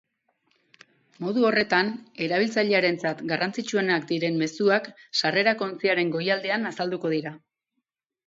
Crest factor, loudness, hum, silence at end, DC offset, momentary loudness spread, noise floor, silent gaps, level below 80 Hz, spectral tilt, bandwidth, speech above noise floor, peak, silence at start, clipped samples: 20 dB; -25 LUFS; none; 0.9 s; under 0.1%; 7 LU; -81 dBFS; none; -74 dBFS; -5 dB/octave; 8 kHz; 57 dB; -6 dBFS; 1.2 s; under 0.1%